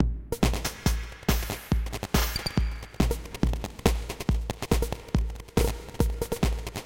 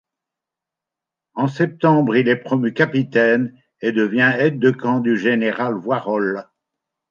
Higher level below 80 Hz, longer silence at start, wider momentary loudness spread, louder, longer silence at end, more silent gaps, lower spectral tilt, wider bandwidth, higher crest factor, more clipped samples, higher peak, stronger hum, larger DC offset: first, -30 dBFS vs -68 dBFS; second, 0 s vs 1.35 s; second, 3 LU vs 8 LU; second, -29 LUFS vs -18 LUFS; second, 0 s vs 0.7 s; neither; second, -5 dB/octave vs -8 dB/octave; first, 17 kHz vs 7.2 kHz; first, 24 dB vs 16 dB; neither; about the same, -4 dBFS vs -2 dBFS; neither; neither